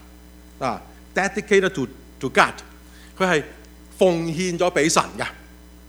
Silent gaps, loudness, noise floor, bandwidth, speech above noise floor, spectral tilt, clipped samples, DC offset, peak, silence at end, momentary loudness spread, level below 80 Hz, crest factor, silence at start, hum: none; -22 LUFS; -45 dBFS; over 20 kHz; 24 dB; -4 dB/octave; under 0.1%; under 0.1%; 0 dBFS; 0.35 s; 13 LU; -48 dBFS; 24 dB; 0.6 s; none